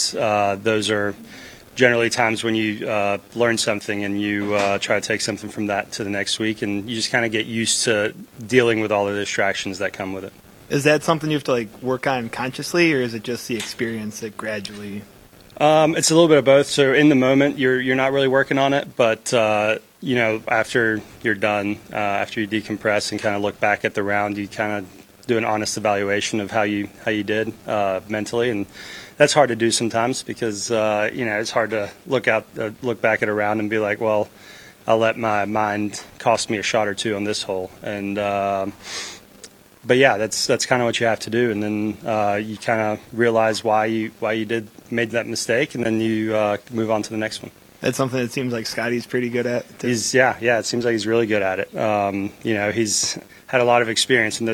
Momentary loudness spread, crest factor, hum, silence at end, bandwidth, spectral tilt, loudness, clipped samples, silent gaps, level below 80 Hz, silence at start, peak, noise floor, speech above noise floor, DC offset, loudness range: 10 LU; 20 dB; none; 0 s; 19 kHz; -4 dB/octave; -20 LUFS; under 0.1%; none; -58 dBFS; 0 s; 0 dBFS; -45 dBFS; 25 dB; under 0.1%; 5 LU